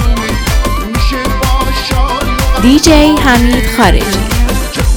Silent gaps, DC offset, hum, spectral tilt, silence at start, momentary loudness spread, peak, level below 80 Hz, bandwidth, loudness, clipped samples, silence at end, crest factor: none; under 0.1%; none; -4.5 dB/octave; 0 s; 7 LU; 0 dBFS; -14 dBFS; 20 kHz; -10 LUFS; 0.8%; 0 s; 10 dB